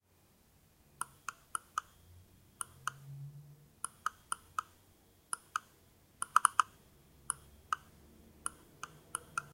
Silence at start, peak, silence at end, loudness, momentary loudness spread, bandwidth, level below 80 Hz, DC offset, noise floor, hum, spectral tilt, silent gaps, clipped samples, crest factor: 1 s; -6 dBFS; 0.1 s; -39 LUFS; 19 LU; 16 kHz; -70 dBFS; under 0.1%; -69 dBFS; none; -0.5 dB/octave; none; under 0.1%; 36 dB